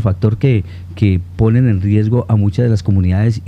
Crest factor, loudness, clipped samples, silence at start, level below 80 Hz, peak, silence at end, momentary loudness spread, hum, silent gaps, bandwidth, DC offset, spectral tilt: 12 dB; -14 LUFS; under 0.1%; 0 s; -34 dBFS; 0 dBFS; 0 s; 3 LU; none; none; 7.6 kHz; under 0.1%; -9.5 dB/octave